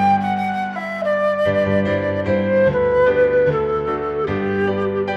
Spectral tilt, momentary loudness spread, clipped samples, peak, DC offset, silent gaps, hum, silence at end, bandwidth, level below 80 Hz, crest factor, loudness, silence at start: -8 dB/octave; 6 LU; under 0.1%; -6 dBFS; under 0.1%; none; none; 0 s; 7.4 kHz; -46 dBFS; 12 dB; -18 LUFS; 0 s